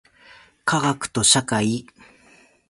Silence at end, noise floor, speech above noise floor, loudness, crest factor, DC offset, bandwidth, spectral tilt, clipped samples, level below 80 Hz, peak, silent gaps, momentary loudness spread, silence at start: 0.9 s; -54 dBFS; 34 dB; -20 LUFS; 22 dB; under 0.1%; 11.5 kHz; -3 dB/octave; under 0.1%; -56 dBFS; -2 dBFS; none; 11 LU; 0.65 s